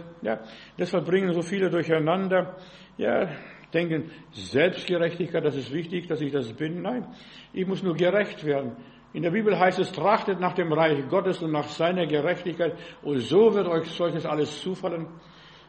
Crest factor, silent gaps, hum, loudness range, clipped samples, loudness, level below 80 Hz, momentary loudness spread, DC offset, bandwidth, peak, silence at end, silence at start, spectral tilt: 20 dB; none; none; 4 LU; under 0.1%; -26 LUFS; -66 dBFS; 13 LU; under 0.1%; 8.4 kHz; -6 dBFS; 0.15 s; 0 s; -6.5 dB/octave